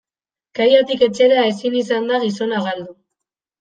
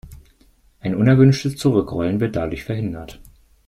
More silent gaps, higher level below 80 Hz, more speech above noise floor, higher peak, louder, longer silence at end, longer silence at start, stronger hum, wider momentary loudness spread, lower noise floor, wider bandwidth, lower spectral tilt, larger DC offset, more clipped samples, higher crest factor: neither; second, -66 dBFS vs -44 dBFS; first, 73 dB vs 37 dB; about the same, -2 dBFS vs -2 dBFS; about the same, -17 LUFS vs -19 LUFS; first, 0.7 s vs 0.45 s; first, 0.55 s vs 0.05 s; neither; second, 13 LU vs 16 LU; first, -89 dBFS vs -55 dBFS; second, 9.2 kHz vs 12.5 kHz; second, -5 dB/octave vs -7.5 dB/octave; neither; neither; about the same, 16 dB vs 18 dB